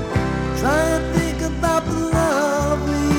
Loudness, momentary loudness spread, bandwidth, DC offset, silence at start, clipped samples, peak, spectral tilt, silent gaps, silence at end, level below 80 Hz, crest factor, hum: -20 LUFS; 4 LU; 18.5 kHz; under 0.1%; 0 s; under 0.1%; -4 dBFS; -5.5 dB/octave; none; 0 s; -30 dBFS; 14 dB; none